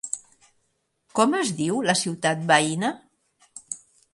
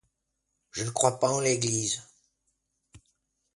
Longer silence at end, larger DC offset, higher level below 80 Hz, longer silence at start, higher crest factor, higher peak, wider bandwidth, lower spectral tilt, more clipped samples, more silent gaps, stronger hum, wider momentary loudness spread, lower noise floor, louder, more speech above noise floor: second, 0.35 s vs 0.6 s; neither; about the same, -70 dBFS vs -66 dBFS; second, 0.05 s vs 0.75 s; about the same, 22 dB vs 24 dB; about the same, -4 dBFS vs -6 dBFS; about the same, 11.5 kHz vs 11.5 kHz; about the same, -3.5 dB/octave vs -3.5 dB/octave; neither; neither; neither; first, 16 LU vs 10 LU; second, -73 dBFS vs -80 dBFS; first, -23 LUFS vs -27 LUFS; about the same, 50 dB vs 53 dB